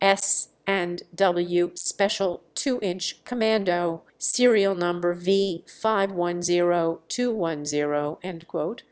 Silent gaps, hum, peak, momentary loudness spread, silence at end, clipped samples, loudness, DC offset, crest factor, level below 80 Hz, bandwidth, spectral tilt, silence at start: none; none; -4 dBFS; 8 LU; 0.1 s; under 0.1%; -25 LUFS; under 0.1%; 20 dB; -68 dBFS; 8 kHz; -3.5 dB/octave; 0 s